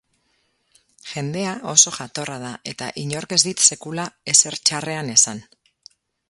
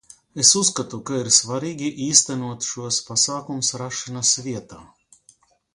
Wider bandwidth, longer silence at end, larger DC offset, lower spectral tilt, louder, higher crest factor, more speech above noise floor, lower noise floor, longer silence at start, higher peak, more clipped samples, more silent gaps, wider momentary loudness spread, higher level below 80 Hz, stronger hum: second, 12 kHz vs 16 kHz; about the same, 0.9 s vs 0.9 s; neither; about the same, -1.5 dB/octave vs -2 dB/octave; about the same, -18 LUFS vs -19 LUFS; about the same, 22 dB vs 24 dB; first, 46 dB vs 35 dB; first, -67 dBFS vs -57 dBFS; first, 1.05 s vs 0.35 s; about the same, 0 dBFS vs 0 dBFS; neither; neither; about the same, 15 LU vs 13 LU; about the same, -64 dBFS vs -62 dBFS; neither